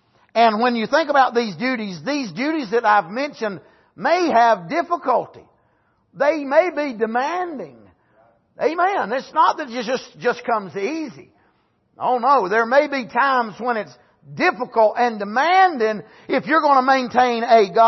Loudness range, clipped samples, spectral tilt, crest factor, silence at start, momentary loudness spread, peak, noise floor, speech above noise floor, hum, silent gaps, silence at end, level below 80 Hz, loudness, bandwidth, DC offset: 5 LU; under 0.1%; -5 dB/octave; 16 dB; 0.35 s; 11 LU; -4 dBFS; -63 dBFS; 44 dB; none; none; 0 s; -70 dBFS; -19 LUFS; 6.2 kHz; under 0.1%